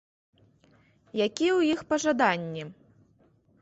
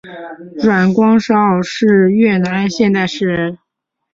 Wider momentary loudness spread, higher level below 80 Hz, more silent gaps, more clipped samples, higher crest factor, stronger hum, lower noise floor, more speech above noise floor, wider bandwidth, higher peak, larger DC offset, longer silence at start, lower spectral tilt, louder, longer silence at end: first, 14 LU vs 11 LU; second, -68 dBFS vs -52 dBFS; neither; neither; first, 20 dB vs 12 dB; neither; second, -64 dBFS vs -75 dBFS; second, 38 dB vs 62 dB; about the same, 8.2 kHz vs 7.6 kHz; second, -10 dBFS vs -2 dBFS; neither; first, 1.15 s vs 0.05 s; second, -4.5 dB/octave vs -6.5 dB/octave; second, -26 LUFS vs -13 LUFS; first, 0.9 s vs 0.6 s